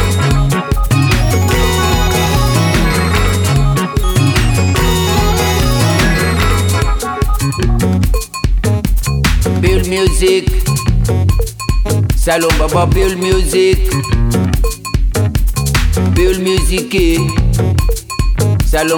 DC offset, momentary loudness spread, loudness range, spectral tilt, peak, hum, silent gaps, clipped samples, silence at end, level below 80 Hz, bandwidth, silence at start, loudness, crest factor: under 0.1%; 4 LU; 2 LU; -5 dB/octave; 0 dBFS; none; none; under 0.1%; 0 s; -16 dBFS; 19.5 kHz; 0 s; -13 LUFS; 12 dB